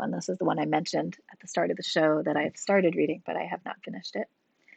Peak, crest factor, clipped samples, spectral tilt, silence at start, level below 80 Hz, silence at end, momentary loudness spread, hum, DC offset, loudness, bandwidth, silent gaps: -12 dBFS; 18 dB; under 0.1%; -5 dB/octave; 0 s; -82 dBFS; 0.5 s; 13 LU; none; under 0.1%; -29 LUFS; 9 kHz; none